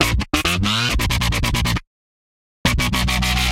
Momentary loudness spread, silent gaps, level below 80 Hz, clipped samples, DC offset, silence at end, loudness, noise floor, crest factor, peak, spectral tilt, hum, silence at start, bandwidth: 4 LU; 1.87-2.64 s; -26 dBFS; under 0.1%; under 0.1%; 0 s; -19 LUFS; under -90 dBFS; 20 dB; 0 dBFS; -3.5 dB/octave; none; 0 s; 16.5 kHz